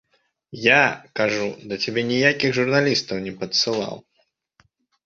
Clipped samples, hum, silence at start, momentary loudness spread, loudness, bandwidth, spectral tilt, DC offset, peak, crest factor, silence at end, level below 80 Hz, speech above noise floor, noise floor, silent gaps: under 0.1%; none; 0.5 s; 12 LU; -20 LUFS; 7.8 kHz; -4 dB/octave; under 0.1%; -2 dBFS; 22 dB; 1.05 s; -62 dBFS; 42 dB; -63 dBFS; none